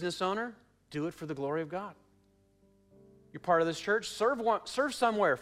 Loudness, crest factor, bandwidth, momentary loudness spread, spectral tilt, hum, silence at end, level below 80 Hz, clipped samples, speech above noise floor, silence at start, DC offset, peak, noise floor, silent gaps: -32 LUFS; 18 dB; 15 kHz; 13 LU; -4.5 dB/octave; none; 0 s; -70 dBFS; under 0.1%; 36 dB; 0 s; under 0.1%; -14 dBFS; -67 dBFS; none